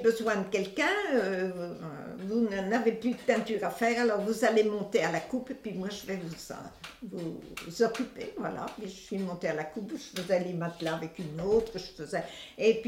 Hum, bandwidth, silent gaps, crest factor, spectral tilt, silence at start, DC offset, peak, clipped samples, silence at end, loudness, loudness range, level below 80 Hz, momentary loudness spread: none; 16.5 kHz; none; 20 dB; -5 dB/octave; 0 s; under 0.1%; -12 dBFS; under 0.1%; 0 s; -31 LUFS; 7 LU; -62 dBFS; 13 LU